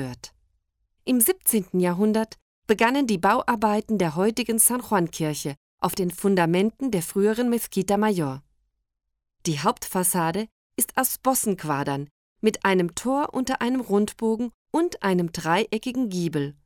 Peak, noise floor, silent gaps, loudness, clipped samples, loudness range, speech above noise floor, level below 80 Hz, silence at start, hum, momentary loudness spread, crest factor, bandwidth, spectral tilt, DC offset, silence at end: -6 dBFS; -72 dBFS; 2.42-2.62 s, 5.57-5.78 s, 10.52-10.70 s, 12.11-12.36 s, 14.54-14.65 s; -24 LUFS; under 0.1%; 3 LU; 49 dB; -58 dBFS; 0 s; none; 9 LU; 18 dB; over 20 kHz; -4.5 dB/octave; under 0.1%; 0.15 s